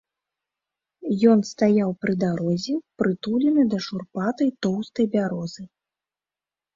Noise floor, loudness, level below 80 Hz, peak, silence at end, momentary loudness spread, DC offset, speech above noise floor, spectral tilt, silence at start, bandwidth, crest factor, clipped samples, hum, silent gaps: under -90 dBFS; -23 LUFS; -64 dBFS; -6 dBFS; 1.1 s; 10 LU; under 0.1%; over 68 dB; -7 dB/octave; 1 s; 7.6 kHz; 18 dB; under 0.1%; 50 Hz at -50 dBFS; none